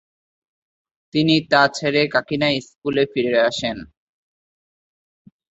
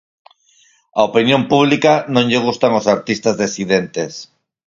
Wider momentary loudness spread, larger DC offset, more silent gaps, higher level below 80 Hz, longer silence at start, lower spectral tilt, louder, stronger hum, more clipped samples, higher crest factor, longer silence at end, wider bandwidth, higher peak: about the same, 9 LU vs 11 LU; neither; neither; about the same, -58 dBFS vs -56 dBFS; first, 1.15 s vs 0.95 s; about the same, -5 dB/octave vs -5 dB/octave; second, -19 LUFS vs -15 LUFS; neither; neither; about the same, 20 dB vs 16 dB; first, 1.7 s vs 0.45 s; about the same, 8.2 kHz vs 7.6 kHz; about the same, -2 dBFS vs 0 dBFS